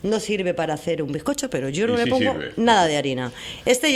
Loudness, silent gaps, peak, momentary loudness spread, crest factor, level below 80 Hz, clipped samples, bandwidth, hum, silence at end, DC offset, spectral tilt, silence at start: -22 LUFS; none; -4 dBFS; 8 LU; 18 dB; -52 dBFS; under 0.1%; 15.5 kHz; none; 0 s; under 0.1%; -4 dB/octave; 0 s